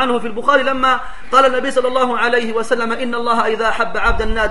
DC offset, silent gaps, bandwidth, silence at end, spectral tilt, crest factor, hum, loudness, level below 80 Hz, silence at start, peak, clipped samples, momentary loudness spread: 6%; none; 11.5 kHz; 0 s; -4 dB/octave; 16 dB; none; -16 LUFS; -30 dBFS; 0 s; 0 dBFS; under 0.1%; 5 LU